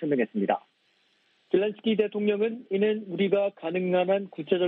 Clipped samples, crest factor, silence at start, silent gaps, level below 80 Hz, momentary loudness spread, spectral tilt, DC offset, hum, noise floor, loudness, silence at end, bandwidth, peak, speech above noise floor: under 0.1%; 18 dB; 0 s; none; -74 dBFS; 4 LU; -9.5 dB/octave; under 0.1%; none; -68 dBFS; -27 LUFS; 0 s; 4.1 kHz; -10 dBFS; 42 dB